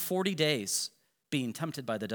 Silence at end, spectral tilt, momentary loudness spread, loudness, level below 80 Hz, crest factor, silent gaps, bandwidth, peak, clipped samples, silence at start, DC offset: 0 s; -3.5 dB/octave; 8 LU; -32 LUFS; -84 dBFS; 22 dB; none; over 20 kHz; -12 dBFS; under 0.1%; 0 s; under 0.1%